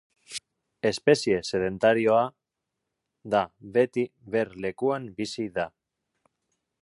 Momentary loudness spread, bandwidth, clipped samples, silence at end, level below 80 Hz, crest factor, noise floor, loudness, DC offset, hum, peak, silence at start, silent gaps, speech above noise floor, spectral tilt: 12 LU; 11.5 kHz; under 0.1%; 1.15 s; -62 dBFS; 20 dB; -84 dBFS; -26 LUFS; under 0.1%; none; -8 dBFS; 0.3 s; none; 59 dB; -5 dB/octave